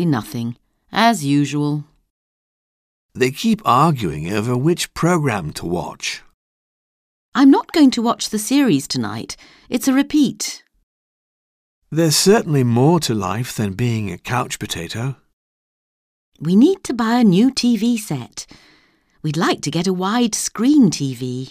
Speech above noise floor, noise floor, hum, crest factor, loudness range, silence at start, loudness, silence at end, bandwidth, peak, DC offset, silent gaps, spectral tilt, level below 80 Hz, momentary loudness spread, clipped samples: 39 dB; -57 dBFS; none; 18 dB; 4 LU; 0 s; -18 LUFS; 0 s; 16 kHz; -2 dBFS; under 0.1%; 2.10-3.09 s, 6.34-7.32 s, 10.83-11.82 s, 15.33-16.32 s; -5 dB/octave; -52 dBFS; 13 LU; under 0.1%